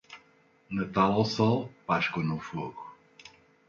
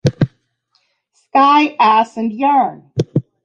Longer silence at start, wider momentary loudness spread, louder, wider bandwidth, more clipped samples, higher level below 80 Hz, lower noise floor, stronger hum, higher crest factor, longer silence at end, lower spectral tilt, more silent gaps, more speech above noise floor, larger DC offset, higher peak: about the same, 0.1 s vs 0.05 s; first, 22 LU vs 10 LU; second, -29 LUFS vs -15 LUFS; second, 7.6 kHz vs 9 kHz; neither; second, -62 dBFS vs -48 dBFS; about the same, -63 dBFS vs -63 dBFS; neither; first, 20 dB vs 14 dB; first, 0.4 s vs 0.25 s; about the same, -6.5 dB/octave vs -7 dB/octave; neither; second, 35 dB vs 50 dB; neither; second, -12 dBFS vs 0 dBFS